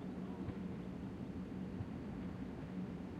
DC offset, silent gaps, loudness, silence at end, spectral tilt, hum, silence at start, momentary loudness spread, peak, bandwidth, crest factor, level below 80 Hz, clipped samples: under 0.1%; none; -46 LUFS; 0 s; -8.5 dB/octave; none; 0 s; 2 LU; -32 dBFS; 9.6 kHz; 14 dB; -60 dBFS; under 0.1%